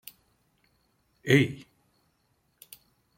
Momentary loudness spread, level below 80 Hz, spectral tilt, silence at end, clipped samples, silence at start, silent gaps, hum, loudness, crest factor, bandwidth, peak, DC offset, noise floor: 27 LU; -66 dBFS; -6 dB/octave; 1.6 s; under 0.1%; 1.25 s; none; none; -24 LUFS; 26 dB; 16.5 kHz; -6 dBFS; under 0.1%; -72 dBFS